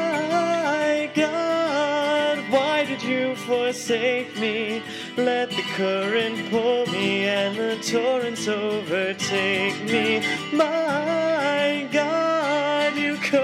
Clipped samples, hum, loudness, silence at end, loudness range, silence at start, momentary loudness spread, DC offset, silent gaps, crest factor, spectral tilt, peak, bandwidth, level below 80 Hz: under 0.1%; none; -23 LUFS; 0 s; 2 LU; 0 s; 3 LU; under 0.1%; none; 16 dB; -4 dB/octave; -6 dBFS; 15.5 kHz; -76 dBFS